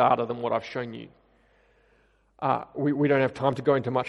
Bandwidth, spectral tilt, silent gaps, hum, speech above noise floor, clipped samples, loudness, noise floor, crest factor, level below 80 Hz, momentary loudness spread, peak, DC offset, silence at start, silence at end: 10 kHz; -8 dB/octave; none; none; 39 dB; under 0.1%; -26 LUFS; -64 dBFS; 18 dB; -66 dBFS; 11 LU; -8 dBFS; under 0.1%; 0 s; 0 s